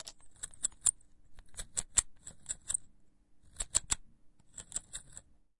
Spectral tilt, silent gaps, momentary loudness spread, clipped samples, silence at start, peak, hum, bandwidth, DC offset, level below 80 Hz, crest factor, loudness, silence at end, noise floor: 0.5 dB/octave; none; 19 LU; under 0.1%; 0 s; -10 dBFS; none; 11.5 kHz; under 0.1%; -56 dBFS; 30 dB; -34 LUFS; 0.25 s; -63 dBFS